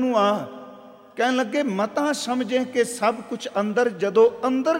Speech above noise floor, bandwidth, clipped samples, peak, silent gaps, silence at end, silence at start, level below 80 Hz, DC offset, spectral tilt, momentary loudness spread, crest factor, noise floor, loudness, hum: 23 dB; 16 kHz; under 0.1%; -6 dBFS; none; 0 s; 0 s; -76 dBFS; under 0.1%; -4.5 dB/octave; 12 LU; 16 dB; -45 dBFS; -22 LUFS; none